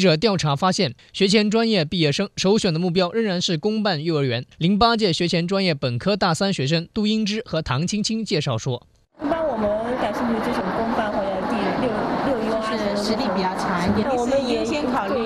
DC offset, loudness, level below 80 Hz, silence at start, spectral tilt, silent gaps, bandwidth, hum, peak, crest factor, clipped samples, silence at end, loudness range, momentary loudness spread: under 0.1%; -21 LUFS; -48 dBFS; 0 s; -5 dB/octave; none; 13 kHz; none; -2 dBFS; 18 dB; under 0.1%; 0 s; 4 LU; 5 LU